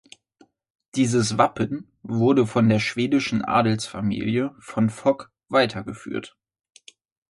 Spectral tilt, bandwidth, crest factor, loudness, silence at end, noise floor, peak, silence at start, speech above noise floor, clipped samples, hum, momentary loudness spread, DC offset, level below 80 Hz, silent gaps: -6 dB/octave; 11.5 kHz; 20 dB; -23 LUFS; 1 s; -59 dBFS; -4 dBFS; 0.95 s; 37 dB; under 0.1%; none; 12 LU; under 0.1%; -56 dBFS; none